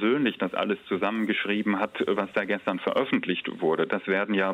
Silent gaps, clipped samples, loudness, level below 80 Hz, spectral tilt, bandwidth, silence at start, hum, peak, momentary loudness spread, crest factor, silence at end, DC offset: none; under 0.1%; -27 LUFS; -70 dBFS; -7 dB/octave; 9.4 kHz; 0 s; none; -12 dBFS; 3 LU; 14 dB; 0 s; under 0.1%